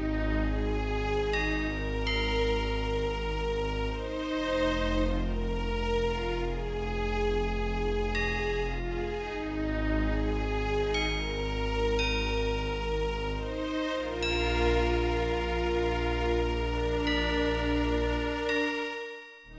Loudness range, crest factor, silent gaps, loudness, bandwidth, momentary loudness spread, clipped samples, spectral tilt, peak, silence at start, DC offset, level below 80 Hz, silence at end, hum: 2 LU; 14 dB; none; -30 LUFS; 8 kHz; 5 LU; under 0.1%; -6 dB/octave; -16 dBFS; 0 s; under 0.1%; -34 dBFS; 0 s; none